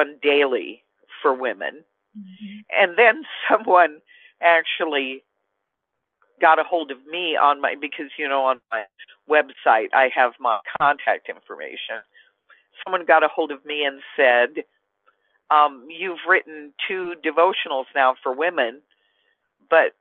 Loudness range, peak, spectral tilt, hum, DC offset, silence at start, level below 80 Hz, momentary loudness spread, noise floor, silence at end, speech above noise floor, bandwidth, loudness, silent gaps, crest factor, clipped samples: 3 LU; -2 dBFS; -6 dB/octave; none; under 0.1%; 0 s; -80 dBFS; 15 LU; -80 dBFS; 0.1 s; 59 dB; 4.3 kHz; -20 LUFS; none; 20 dB; under 0.1%